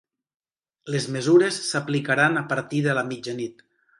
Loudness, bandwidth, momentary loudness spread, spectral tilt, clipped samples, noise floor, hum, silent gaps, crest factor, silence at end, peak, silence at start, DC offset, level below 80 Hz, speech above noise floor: -23 LUFS; 11.5 kHz; 12 LU; -5 dB/octave; under 0.1%; under -90 dBFS; none; none; 18 dB; 0.5 s; -6 dBFS; 0.85 s; under 0.1%; -70 dBFS; over 67 dB